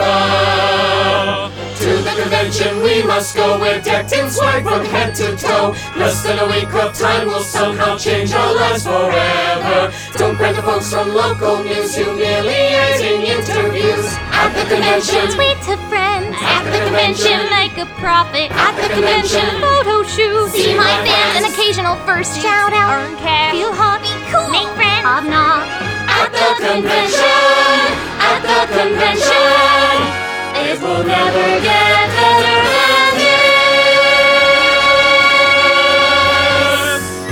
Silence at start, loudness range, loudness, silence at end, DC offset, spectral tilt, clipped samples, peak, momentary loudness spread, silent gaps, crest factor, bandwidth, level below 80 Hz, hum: 0 s; 6 LU; -12 LUFS; 0 s; under 0.1%; -3 dB/octave; under 0.1%; 0 dBFS; 8 LU; none; 14 dB; over 20 kHz; -40 dBFS; none